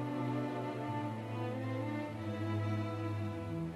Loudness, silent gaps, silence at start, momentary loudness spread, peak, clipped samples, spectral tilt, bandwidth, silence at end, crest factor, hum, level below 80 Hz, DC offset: -39 LUFS; none; 0 s; 3 LU; -26 dBFS; under 0.1%; -8 dB/octave; 12.5 kHz; 0 s; 12 dB; none; -68 dBFS; under 0.1%